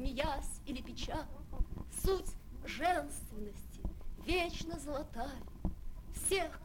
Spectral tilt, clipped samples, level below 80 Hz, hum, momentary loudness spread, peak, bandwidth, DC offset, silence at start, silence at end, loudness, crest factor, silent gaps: -4 dB/octave; under 0.1%; -44 dBFS; none; 14 LU; -20 dBFS; 17.5 kHz; under 0.1%; 0 s; 0 s; -40 LUFS; 20 dB; none